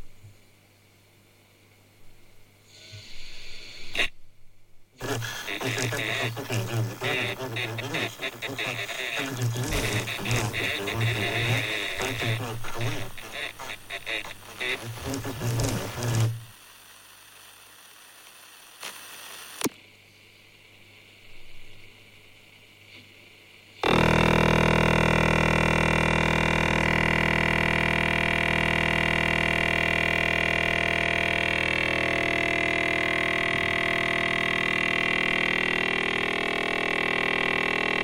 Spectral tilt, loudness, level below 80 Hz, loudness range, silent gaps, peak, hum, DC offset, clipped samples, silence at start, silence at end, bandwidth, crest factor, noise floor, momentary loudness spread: -4.5 dB/octave; -25 LUFS; -42 dBFS; 17 LU; none; -6 dBFS; 50 Hz at -40 dBFS; under 0.1%; under 0.1%; 0 s; 0 s; 17 kHz; 20 dB; -58 dBFS; 12 LU